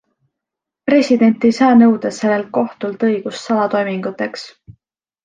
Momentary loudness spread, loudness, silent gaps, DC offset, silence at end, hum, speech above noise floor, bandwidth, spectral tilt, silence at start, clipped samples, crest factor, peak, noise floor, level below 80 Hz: 13 LU; -15 LUFS; none; under 0.1%; 0.55 s; none; 68 dB; 9 kHz; -6 dB/octave; 0.85 s; under 0.1%; 14 dB; -2 dBFS; -83 dBFS; -60 dBFS